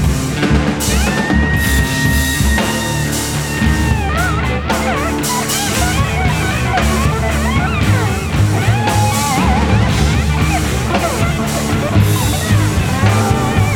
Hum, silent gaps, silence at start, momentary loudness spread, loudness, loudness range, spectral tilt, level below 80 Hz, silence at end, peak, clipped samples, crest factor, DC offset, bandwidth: none; none; 0 s; 3 LU; -14 LUFS; 1 LU; -5 dB/octave; -22 dBFS; 0 s; 0 dBFS; under 0.1%; 14 dB; under 0.1%; 18 kHz